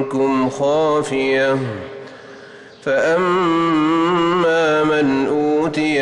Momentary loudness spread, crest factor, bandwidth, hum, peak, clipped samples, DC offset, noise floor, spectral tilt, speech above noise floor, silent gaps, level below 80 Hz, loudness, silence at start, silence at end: 12 LU; 8 dB; 11 kHz; none; -8 dBFS; under 0.1%; under 0.1%; -39 dBFS; -5.5 dB/octave; 23 dB; none; -54 dBFS; -17 LUFS; 0 s; 0 s